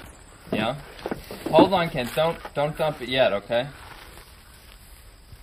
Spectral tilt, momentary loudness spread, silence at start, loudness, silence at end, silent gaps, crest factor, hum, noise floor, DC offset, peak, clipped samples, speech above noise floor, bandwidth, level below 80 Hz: -5.5 dB/octave; 24 LU; 0 s; -24 LUFS; 0.05 s; none; 22 dB; none; -48 dBFS; under 0.1%; -4 dBFS; under 0.1%; 25 dB; 15.5 kHz; -48 dBFS